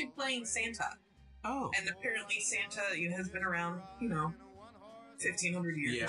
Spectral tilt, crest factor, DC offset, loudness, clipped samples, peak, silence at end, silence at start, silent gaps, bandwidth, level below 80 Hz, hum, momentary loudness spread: -3 dB/octave; 18 dB; under 0.1%; -36 LUFS; under 0.1%; -20 dBFS; 0 s; 0 s; none; 11.5 kHz; -64 dBFS; none; 19 LU